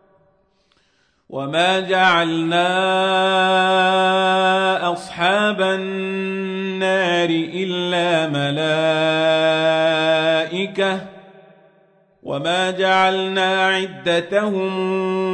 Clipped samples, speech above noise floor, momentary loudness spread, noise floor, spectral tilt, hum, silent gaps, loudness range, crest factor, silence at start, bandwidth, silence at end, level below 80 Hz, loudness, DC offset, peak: under 0.1%; 44 dB; 8 LU; -62 dBFS; -4.5 dB/octave; none; none; 4 LU; 16 dB; 1.3 s; 10 kHz; 0 s; -66 dBFS; -18 LUFS; under 0.1%; -2 dBFS